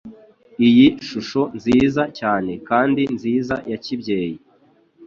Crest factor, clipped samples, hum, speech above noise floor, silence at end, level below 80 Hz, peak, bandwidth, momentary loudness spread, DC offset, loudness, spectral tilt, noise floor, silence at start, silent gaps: 16 dB; under 0.1%; none; 38 dB; 0 s; -52 dBFS; -2 dBFS; 7.2 kHz; 13 LU; under 0.1%; -19 LUFS; -6.5 dB/octave; -56 dBFS; 0.05 s; none